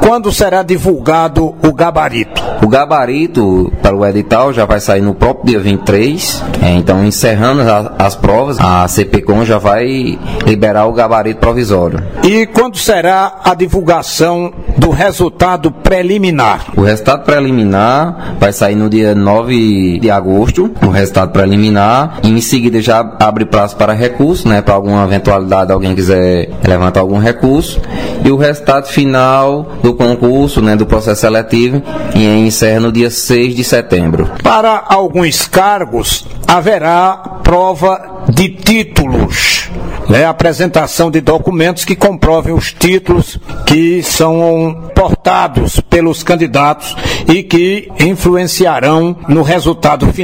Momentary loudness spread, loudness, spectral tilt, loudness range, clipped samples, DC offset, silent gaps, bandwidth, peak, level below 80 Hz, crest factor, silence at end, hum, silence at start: 4 LU; -10 LUFS; -5.5 dB/octave; 1 LU; 0.4%; 2%; none; 16.5 kHz; 0 dBFS; -24 dBFS; 10 dB; 0 s; none; 0 s